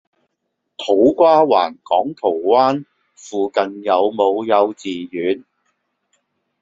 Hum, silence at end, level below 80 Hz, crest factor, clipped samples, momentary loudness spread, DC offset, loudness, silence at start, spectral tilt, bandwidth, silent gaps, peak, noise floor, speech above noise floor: none; 1.25 s; -62 dBFS; 16 dB; under 0.1%; 13 LU; under 0.1%; -17 LUFS; 0.8 s; -5.5 dB/octave; 7.8 kHz; none; -2 dBFS; -74 dBFS; 58 dB